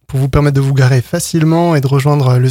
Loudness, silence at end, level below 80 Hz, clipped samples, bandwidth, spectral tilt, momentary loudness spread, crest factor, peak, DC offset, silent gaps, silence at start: -12 LUFS; 0 s; -32 dBFS; under 0.1%; 16 kHz; -6.5 dB/octave; 3 LU; 10 dB; 0 dBFS; under 0.1%; none; 0.1 s